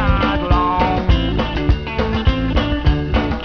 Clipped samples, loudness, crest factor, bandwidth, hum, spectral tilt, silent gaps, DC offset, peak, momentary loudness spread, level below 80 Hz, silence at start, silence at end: under 0.1%; -18 LUFS; 14 dB; 5.4 kHz; none; -8 dB/octave; none; 0.5%; -2 dBFS; 3 LU; -20 dBFS; 0 s; 0 s